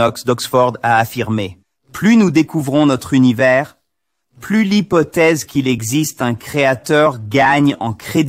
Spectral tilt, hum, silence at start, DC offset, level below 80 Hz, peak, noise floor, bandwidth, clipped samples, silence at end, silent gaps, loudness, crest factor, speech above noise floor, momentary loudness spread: -5.5 dB/octave; none; 0 s; under 0.1%; -50 dBFS; -2 dBFS; -75 dBFS; 16 kHz; under 0.1%; 0 s; none; -14 LUFS; 12 dB; 61 dB; 8 LU